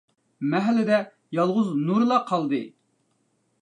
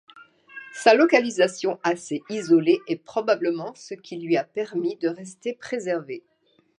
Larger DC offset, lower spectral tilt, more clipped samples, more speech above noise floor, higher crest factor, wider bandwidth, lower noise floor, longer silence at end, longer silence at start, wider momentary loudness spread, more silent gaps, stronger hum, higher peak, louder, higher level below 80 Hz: neither; first, -7.5 dB/octave vs -4.5 dB/octave; neither; first, 47 dB vs 21 dB; about the same, 18 dB vs 22 dB; second, 9.6 kHz vs 11 kHz; first, -70 dBFS vs -44 dBFS; first, 0.95 s vs 0.6 s; first, 0.4 s vs 0.2 s; second, 9 LU vs 18 LU; neither; neither; second, -8 dBFS vs -2 dBFS; about the same, -24 LUFS vs -23 LUFS; about the same, -78 dBFS vs -78 dBFS